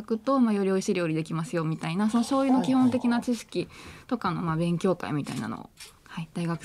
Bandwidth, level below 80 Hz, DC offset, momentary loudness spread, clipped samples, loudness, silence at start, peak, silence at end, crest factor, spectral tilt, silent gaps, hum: 13.5 kHz; -62 dBFS; under 0.1%; 15 LU; under 0.1%; -27 LUFS; 0 s; -12 dBFS; 0 s; 14 dB; -6.5 dB/octave; none; none